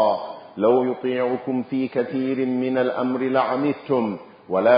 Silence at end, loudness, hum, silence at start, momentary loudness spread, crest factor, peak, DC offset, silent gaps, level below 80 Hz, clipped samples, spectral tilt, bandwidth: 0 s; -23 LUFS; none; 0 s; 6 LU; 18 dB; -4 dBFS; under 0.1%; none; -68 dBFS; under 0.1%; -11 dB/octave; 5.2 kHz